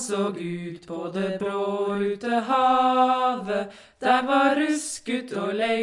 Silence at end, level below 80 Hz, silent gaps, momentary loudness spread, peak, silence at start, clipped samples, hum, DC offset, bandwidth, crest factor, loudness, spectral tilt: 0 s; -68 dBFS; none; 12 LU; -6 dBFS; 0 s; under 0.1%; none; under 0.1%; 11.5 kHz; 16 dB; -24 LUFS; -4.5 dB/octave